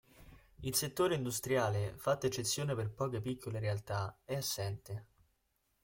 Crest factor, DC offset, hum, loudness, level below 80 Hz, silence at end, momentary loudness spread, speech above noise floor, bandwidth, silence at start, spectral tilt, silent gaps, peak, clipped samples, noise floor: 18 dB; under 0.1%; none; -36 LUFS; -64 dBFS; 0.8 s; 7 LU; 43 dB; 17 kHz; 0.2 s; -4.5 dB/octave; none; -18 dBFS; under 0.1%; -79 dBFS